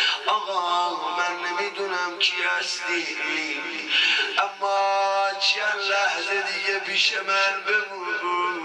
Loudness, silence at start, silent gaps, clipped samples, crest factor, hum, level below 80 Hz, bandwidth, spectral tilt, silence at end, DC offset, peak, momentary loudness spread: -23 LUFS; 0 s; none; under 0.1%; 18 dB; none; under -90 dBFS; 12 kHz; 0 dB/octave; 0 s; under 0.1%; -6 dBFS; 6 LU